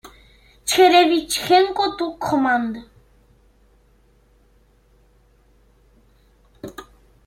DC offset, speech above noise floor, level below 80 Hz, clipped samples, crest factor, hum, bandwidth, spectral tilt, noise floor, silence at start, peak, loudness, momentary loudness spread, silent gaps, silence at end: under 0.1%; 39 dB; -54 dBFS; under 0.1%; 22 dB; none; 16.5 kHz; -3 dB/octave; -56 dBFS; 0.05 s; -2 dBFS; -18 LUFS; 25 LU; none; 0.45 s